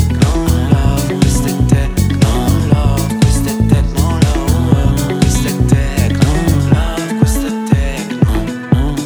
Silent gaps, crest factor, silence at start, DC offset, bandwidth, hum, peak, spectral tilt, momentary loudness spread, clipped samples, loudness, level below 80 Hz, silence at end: none; 12 dB; 0 s; under 0.1%; over 20 kHz; none; 0 dBFS; -6 dB/octave; 3 LU; under 0.1%; -13 LUFS; -18 dBFS; 0 s